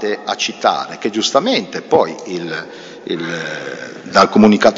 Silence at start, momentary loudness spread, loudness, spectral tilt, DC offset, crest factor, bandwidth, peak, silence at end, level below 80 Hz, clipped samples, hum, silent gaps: 0 s; 16 LU; -16 LUFS; -4.5 dB/octave; under 0.1%; 16 dB; 8 kHz; 0 dBFS; 0 s; -56 dBFS; under 0.1%; none; none